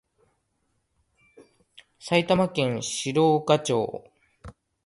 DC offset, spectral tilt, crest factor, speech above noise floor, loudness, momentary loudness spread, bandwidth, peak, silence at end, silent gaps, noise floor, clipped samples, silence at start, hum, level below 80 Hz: under 0.1%; -5 dB/octave; 22 dB; 50 dB; -24 LUFS; 11 LU; 11.5 kHz; -4 dBFS; 0.35 s; none; -74 dBFS; under 0.1%; 2.05 s; none; -60 dBFS